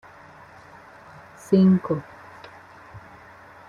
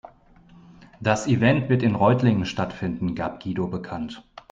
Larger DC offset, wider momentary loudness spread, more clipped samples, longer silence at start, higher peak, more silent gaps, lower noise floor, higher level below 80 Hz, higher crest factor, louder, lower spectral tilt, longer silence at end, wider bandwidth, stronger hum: neither; first, 28 LU vs 13 LU; neither; first, 1.5 s vs 0.8 s; about the same, -6 dBFS vs -4 dBFS; neither; second, -47 dBFS vs -52 dBFS; second, -62 dBFS vs -52 dBFS; about the same, 20 dB vs 20 dB; about the same, -21 LUFS vs -23 LUFS; first, -9 dB/octave vs -7 dB/octave; first, 0.7 s vs 0.3 s; second, 7.2 kHz vs 8 kHz; neither